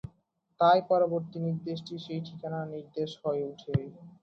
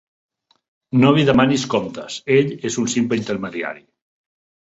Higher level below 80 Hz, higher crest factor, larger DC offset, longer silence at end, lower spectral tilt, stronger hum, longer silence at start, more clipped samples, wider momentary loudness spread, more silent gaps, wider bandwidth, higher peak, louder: second, -62 dBFS vs -52 dBFS; about the same, 18 dB vs 18 dB; neither; second, 0.1 s vs 0.9 s; first, -8 dB/octave vs -5.5 dB/octave; neither; second, 0.05 s vs 0.95 s; neither; about the same, 14 LU vs 14 LU; neither; second, 7 kHz vs 8 kHz; second, -12 dBFS vs -2 dBFS; second, -30 LUFS vs -18 LUFS